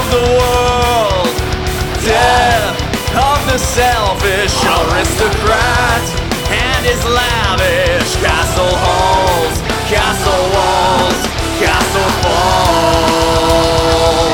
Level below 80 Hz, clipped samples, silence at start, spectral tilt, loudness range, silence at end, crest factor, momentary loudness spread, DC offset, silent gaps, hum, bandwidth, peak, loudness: -22 dBFS; under 0.1%; 0 s; -4 dB/octave; 1 LU; 0 s; 12 dB; 5 LU; under 0.1%; none; none; 20 kHz; 0 dBFS; -12 LUFS